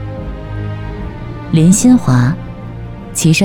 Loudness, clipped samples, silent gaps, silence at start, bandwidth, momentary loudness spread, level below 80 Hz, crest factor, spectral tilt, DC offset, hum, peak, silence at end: -13 LUFS; under 0.1%; none; 0 s; 19 kHz; 19 LU; -30 dBFS; 14 dB; -5.5 dB/octave; under 0.1%; none; 0 dBFS; 0 s